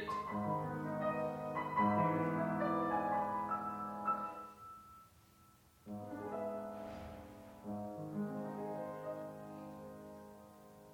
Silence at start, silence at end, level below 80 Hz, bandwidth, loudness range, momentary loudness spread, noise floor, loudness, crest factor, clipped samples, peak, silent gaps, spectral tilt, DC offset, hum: 0 s; 0 s; -72 dBFS; 17 kHz; 11 LU; 19 LU; -66 dBFS; -40 LUFS; 20 dB; under 0.1%; -22 dBFS; none; -8 dB/octave; under 0.1%; none